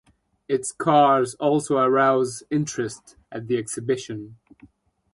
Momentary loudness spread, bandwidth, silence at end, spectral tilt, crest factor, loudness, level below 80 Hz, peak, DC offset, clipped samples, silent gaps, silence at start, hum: 17 LU; 11.5 kHz; 0.8 s; -5 dB/octave; 18 dB; -22 LUFS; -64 dBFS; -4 dBFS; under 0.1%; under 0.1%; none; 0.5 s; none